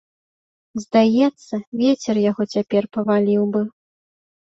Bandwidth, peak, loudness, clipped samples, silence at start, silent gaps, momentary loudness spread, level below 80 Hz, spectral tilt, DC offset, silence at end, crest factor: 7.8 kHz; -4 dBFS; -19 LUFS; under 0.1%; 0.75 s; 1.67-1.72 s; 13 LU; -64 dBFS; -6.5 dB/octave; under 0.1%; 0.7 s; 16 dB